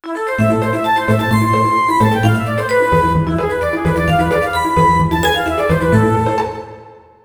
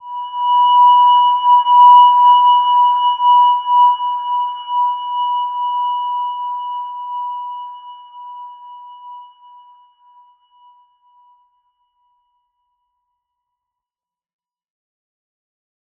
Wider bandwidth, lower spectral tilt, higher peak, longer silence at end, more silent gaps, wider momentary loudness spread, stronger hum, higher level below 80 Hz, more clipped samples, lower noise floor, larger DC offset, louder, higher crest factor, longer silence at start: first, over 20 kHz vs 3.1 kHz; first, -6.5 dB/octave vs 7 dB/octave; about the same, 0 dBFS vs -2 dBFS; second, 0.25 s vs 6.75 s; neither; second, 5 LU vs 21 LU; neither; first, -32 dBFS vs -76 dBFS; neither; second, -39 dBFS vs under -90 dBFS; neither; about the same, -14 LUFS vs -12 LUFS; about the same, 14 dB vs 14 dB; about the same, 0.05 s vs 0.05 s